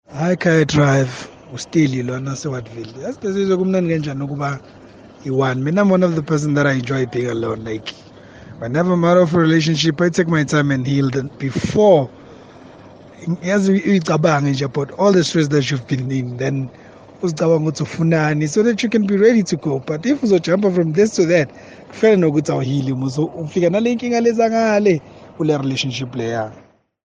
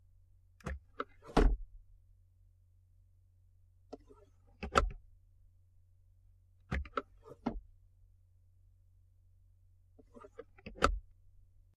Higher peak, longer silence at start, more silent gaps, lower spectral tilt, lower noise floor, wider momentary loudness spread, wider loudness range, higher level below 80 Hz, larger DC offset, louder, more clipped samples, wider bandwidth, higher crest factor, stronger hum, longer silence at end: first, 0 dBFS vs -10 dBFS; second, 0.1 s vs 0.65 s; neither; about the same, -6.5 dB/octave vs -5.5 dB/octave; second, -41 dBFS vs -66 dBFS; second, 11 LU vs 23 LU; second, 3 LU vs 11 LU; second, -54 dBFS vs -44 dBFS; neither; first, -17 LUFS vs -37 LUFS; neither; second, 9.6 kHz vs 11 kHz; second, 16 dB vs 30 dB; neither; second, 0.45 s vs 0.75 s